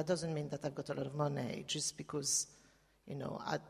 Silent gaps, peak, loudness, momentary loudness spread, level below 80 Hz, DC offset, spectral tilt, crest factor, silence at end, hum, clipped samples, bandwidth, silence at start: none; -22 dBFS; -39 LUFS; 10 LU; -72 dBFS; under 0.1%; -3.5 dB/octave; 18 dB; 0 s; none; under 0.1%; 15 kHz; 0 s